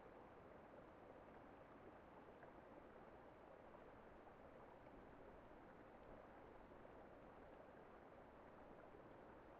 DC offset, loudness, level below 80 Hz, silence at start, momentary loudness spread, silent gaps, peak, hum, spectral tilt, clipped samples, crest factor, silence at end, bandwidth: under 0.1%; -64 LUFS; -76 dBFS; 0 s; 1 LU; none; -48 dBFS; none; -5.5 dB/octave; under 0.1%; 16 dB; 0 s; 4.8 kHz